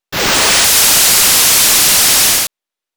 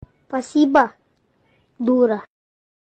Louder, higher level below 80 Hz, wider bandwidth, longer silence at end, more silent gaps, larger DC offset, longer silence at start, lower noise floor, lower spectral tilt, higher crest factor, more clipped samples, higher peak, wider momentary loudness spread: first, -7 LUFS vs -19 LUFS; first, -38 dBFS vs -60 dBFS; first, over 20 kHz vs 9.2 kHz; second, 0.5 s vs 0.75 s; neither; neither; second, 0.1 s vs 0.3 s; second, -36 dBFS vs -63 dBFS; second, 0.5 dB/octave vs -5.5 dB/octave; second, 6 dB vs 18 dB; neither; about the same, -4 dBFS vs -2 dBFS; second, 5 LU vs 12 LU